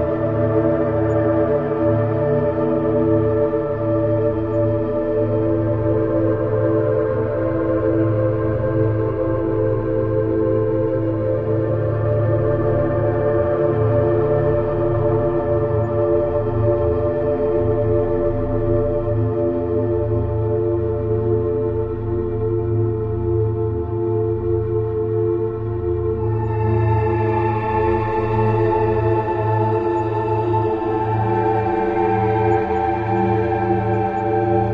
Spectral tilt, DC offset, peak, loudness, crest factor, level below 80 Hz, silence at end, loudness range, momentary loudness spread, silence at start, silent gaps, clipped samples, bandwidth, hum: -11 dB/octave; under 0.1%; -6 dBFS; -19 LUFS; 14 dB; -36 dBFS; 0 s; 2 LU; 3 LU; 0 s; none; under 0.1%; 4.7 kHz; none